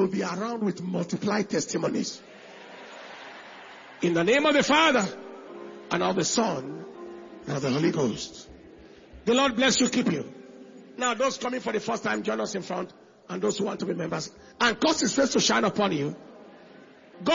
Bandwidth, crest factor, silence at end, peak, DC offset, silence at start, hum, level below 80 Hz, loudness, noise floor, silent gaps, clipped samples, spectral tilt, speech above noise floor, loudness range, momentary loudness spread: 7.6 kHz; 20 dB; 0 s; -6 dBFS; under 0.1%; 0 s; none; -64 dBFS; -26 LUFS; -51 dBFS; none; under 0.1%; -3.5 dB/octave; 25 dB; 6 LU; 21 LU